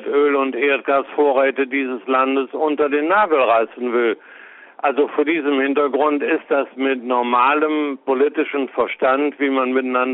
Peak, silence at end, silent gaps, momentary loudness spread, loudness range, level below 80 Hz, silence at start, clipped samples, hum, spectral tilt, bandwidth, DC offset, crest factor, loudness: -4 dBFS; 0 s; none; 6 LU; 2 LU; -68 dBFS; 0 s; under 0.1%; none; -1 dB/octave; 4.1 kHz; under 0.1%; 14 dB; -18 LUFS